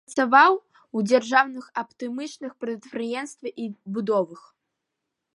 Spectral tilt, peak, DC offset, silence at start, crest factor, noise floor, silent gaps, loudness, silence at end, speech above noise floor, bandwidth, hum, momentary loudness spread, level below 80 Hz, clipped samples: -4.5 dB/octave; -4 dBFS; under 0.1%; 0.1 s; 22 dB; -82 dBFS; none; -24 LUFS; 0.95 s; 59 dB; 11.5 kHz; none; 17 LU; -80 dBFS; under 0.1%